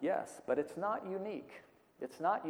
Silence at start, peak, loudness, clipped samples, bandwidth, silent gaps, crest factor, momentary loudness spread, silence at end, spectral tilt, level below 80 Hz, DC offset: 0 s; -20 dBFS; -39 LUFS; under 0.1%; over 20 kHz; none; 18 dB; 13 LU; 0 s; -6 dB/octave; -82 dBFS; under 0.1%